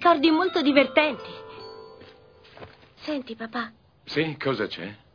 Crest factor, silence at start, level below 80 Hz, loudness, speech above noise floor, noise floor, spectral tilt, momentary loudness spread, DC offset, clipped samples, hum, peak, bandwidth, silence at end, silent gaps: 22 dB; 0 s; -64 dBFS; -24 LUFS; 27 dB; -52 dBFS; -6.5 dB/octave; 21 LU; under 0.1%; under 0.1%; none; -2 dBFS; 5.4 kHz; 0.2 s; none